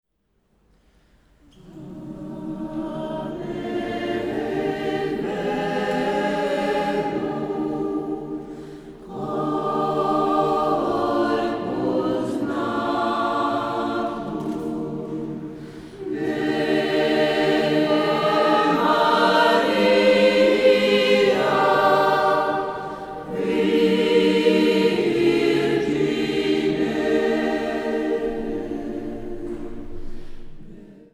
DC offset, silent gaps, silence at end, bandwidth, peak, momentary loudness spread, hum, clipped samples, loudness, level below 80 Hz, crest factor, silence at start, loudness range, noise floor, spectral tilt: under 0.1%; none; 0.15 s; 13.5 kHz; -4 dBFS; 15 LU; none; under 0.1%; -21 LUFS; -46 dBFS; 16 dB; 1.65 s; 10 LU; -68 dBFS; -5.5 dB/octave